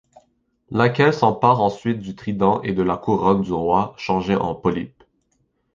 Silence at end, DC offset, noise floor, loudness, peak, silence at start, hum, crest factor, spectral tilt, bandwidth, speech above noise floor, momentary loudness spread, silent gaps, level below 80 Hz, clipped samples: 0.9 s; under 0.1%; -68 dBFS; -20 LUFS; -2 dBFS; 0.7 s; none; 18 dB; -7.5 dB/octave; 7.4 kHz; 48 dB; 10 LU; none; -48 dBFS; under 0.1%